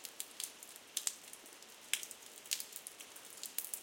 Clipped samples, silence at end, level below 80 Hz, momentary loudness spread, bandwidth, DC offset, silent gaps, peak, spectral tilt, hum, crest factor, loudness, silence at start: under 0.1%; 0 s; under -90 dBFS; 13 LU; 17 kHz; under 0.1%; none; -12 dBFS; 2.5 dB/octave; none; 34 dB; -43 LUFS; 0 s